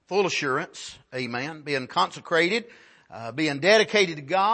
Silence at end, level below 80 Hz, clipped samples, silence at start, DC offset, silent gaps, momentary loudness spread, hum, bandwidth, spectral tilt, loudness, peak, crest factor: 0 s; -72 dBFS; under 0.1%; 0.1 s; under 0.1%; none; 16 LU; none; 8.8 kHz; -3.5 dB/octave; -24 LUFS; -6 dBFS; 20 dB